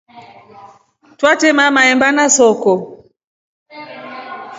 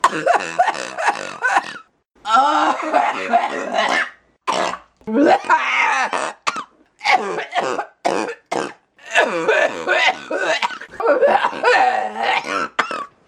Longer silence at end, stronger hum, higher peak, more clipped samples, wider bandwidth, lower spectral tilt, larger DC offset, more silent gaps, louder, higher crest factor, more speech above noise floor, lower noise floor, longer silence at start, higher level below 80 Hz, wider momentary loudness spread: second, 0 s vs 0.2 s; neither; about the same, 0 dBFS vs 0 dBFS; neither; second, 8 kHz vs 15 kHz; about the same, -2 dB/octave vs -2.5 dB/octave; neither; first, 3.24-3.66 s vs none; first, -11 LUFS vs -18 LUFS; about the same, 16 dB vs 18 dB; first, 37 dB vs 26 dB; first, -48 dBFS vs -43 dBFS; about the same, 0.15 s vs 0.05 s; about the same, -62 dBFS vs -66 dBFS; first, 21 LU vs 10 LU